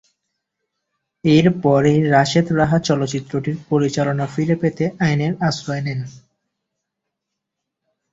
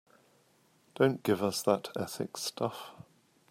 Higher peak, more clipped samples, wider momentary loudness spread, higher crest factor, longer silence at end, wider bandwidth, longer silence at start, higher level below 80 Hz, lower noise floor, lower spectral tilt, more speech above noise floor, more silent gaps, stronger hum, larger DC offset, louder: first, -2 dBFS vs -12 dBFS; neither; about the same, 10 LU vs 9 LU; about the same, 18 dB vs 22 dB; first, 1.95 s vs 0.5 s; second, 7.8 kHz vs 16 kHz; first, 1.25 s vs 1 s; first, -52 dBFS vs -78 dBFS; first, -80 dBFS vs -67 dBFS; first, -6.5 dB/octave vs -4.5 dB/octave; first, 63 dB vs 36 dB; neither; neither; neither; first, -18 LUFS vs -32 LUFS